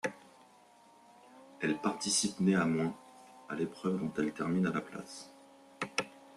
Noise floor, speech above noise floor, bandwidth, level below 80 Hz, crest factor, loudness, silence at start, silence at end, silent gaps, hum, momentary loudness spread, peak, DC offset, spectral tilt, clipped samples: -61 dBFS; 28 dB; 12.5 kHz; -72 dBFS; 20 dB; -34 LUFS; 0.05 s; 0.05 s; none; none; 17 LU; -16 dBFS; under 0.1%; -4.5 dB/octave; under 0.1%